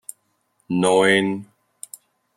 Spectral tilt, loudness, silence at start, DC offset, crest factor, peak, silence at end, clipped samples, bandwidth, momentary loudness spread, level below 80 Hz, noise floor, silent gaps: -4.5 dB/octave; -18 LUFS; 0.7 s; under 0.1%; 20 dB; -4 dBFS; 0.95 s; under 0.1%; 15.5 kHz; 23 LU; -66 dBFS; -68 dBFS; none